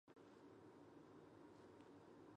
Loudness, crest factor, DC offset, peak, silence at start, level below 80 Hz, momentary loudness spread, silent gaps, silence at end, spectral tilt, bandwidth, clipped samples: -65 LUFS; 14 dB; under 0.1%; -50 dBFS; 0.05 s; -90 dBFS; 1 LU; none; 0 s; -6.5 dB/octave; 9.6 kHz; under 0.1%